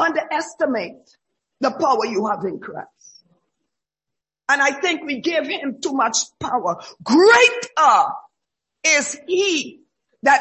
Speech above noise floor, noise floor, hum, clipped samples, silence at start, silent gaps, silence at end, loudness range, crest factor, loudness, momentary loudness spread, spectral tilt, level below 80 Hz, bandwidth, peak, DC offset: 66 dB; -85 dBFS; none; under 0.1%; 0 s; none; 0 s; 8 LU; 18 dB; -18 LUFS; 14 LU; -2 dB/octave; -64 dBFS; 8.6 kHz; -2 dBFS; under 0.1%